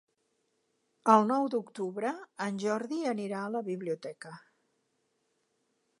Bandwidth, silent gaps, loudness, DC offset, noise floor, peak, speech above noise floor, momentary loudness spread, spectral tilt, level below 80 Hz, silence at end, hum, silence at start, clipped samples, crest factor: 11.5 kHz; none; -31 LUFS; under 0.1%; -77 dBFS; -10 dBFS; 47 dB; 14 LU; -6 dB/octave; -86 dBFS; 1.6 s; none; 1.05 s; under 0.1%; 24 dB